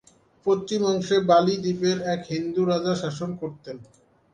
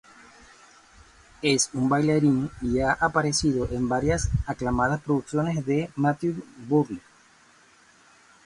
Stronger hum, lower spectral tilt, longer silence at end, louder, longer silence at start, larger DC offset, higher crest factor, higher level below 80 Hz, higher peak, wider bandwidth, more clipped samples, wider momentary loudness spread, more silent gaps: neither; about the same, -6 dB/octave vs -5 dB/octave; second, 0.5 s vs 1.45 s; about the same, -24 LUFS vs -25 LUFS; second, 0.45 s vs 1.4 s; neither; about the same, 18 dB vs 18 dB; second, -64 dBFS vs -42 dBFS; about the same, -6 dBFS vs -8 dBFS; second, 9.6 kHz vs 11.5 kHz; neither; first, 15 LU vs 6 LU; neither